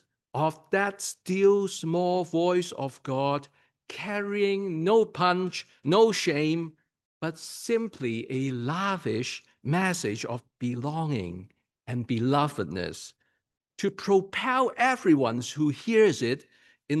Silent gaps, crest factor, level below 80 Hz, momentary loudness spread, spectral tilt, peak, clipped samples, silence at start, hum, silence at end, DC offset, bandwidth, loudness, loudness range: 7.05-7.21 s; 18 dB; -72 dBFS; 13 LU; -5.5 dB/octave; -10 dBFS; under 0.1%; 0.35 s; none; 0 s; under 0.1%; 12.5 kHz; -27 LUFS; 6 LU